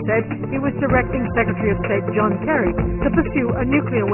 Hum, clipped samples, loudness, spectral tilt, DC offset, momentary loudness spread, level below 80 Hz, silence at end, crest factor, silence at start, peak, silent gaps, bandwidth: none; under 0.1%; -20 LUFS; -12 dB/octave; under 0.1%; 3 LU; -32 dBFS; 0 s; 18 dB; 0 s; -2 dBFS; none; 3.2 kHz